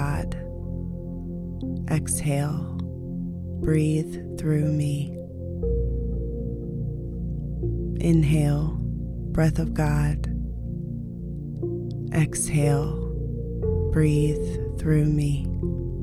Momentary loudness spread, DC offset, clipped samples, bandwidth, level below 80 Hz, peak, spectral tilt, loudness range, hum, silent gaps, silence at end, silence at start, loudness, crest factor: 11 LU; under 0.1%; under 0.1%; 13.5 kHz; -34 dBFS; -8 dBFS; -7 dB/octave; 4 LU; none; none; 0 s; 0 s; -26 LUFS; 16 dB